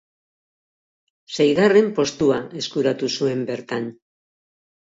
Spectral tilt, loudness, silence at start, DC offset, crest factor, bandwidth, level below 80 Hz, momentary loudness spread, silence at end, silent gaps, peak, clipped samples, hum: -5 dB/octave; -20 LUFS; 1.3 s; under 0.1%; 18 dB; 7.8 kHz; -62 dBFS; 13 LU; 0.95 s; none; -4 dBFS; under 0.1%; none